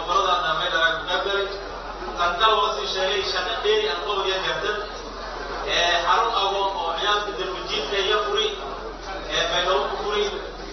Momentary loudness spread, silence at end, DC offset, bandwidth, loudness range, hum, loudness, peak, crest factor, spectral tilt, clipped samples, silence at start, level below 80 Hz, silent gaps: 13 LU; 0 s; under 0.1%; 6.6 kHz; 2 LU; none; -23 LUFS; -6 dBFS; 18 dB; 0.5 dB/octave; under 0.1%; 0 s; -42 dBFS; none